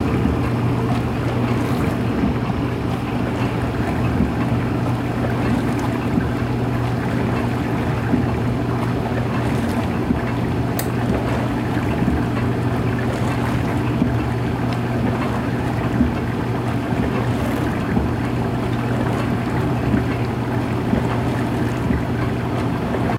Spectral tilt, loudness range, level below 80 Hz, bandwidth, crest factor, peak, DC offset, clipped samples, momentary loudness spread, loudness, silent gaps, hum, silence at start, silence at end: -7.5 dB/octave; 0 LU; -32 dBFS; 16 kHz; 14 dB; -6 dBFS; under 0.1%; under 0.1%; 2 LU; -21 LUFS; none; none; 0 s; 0 s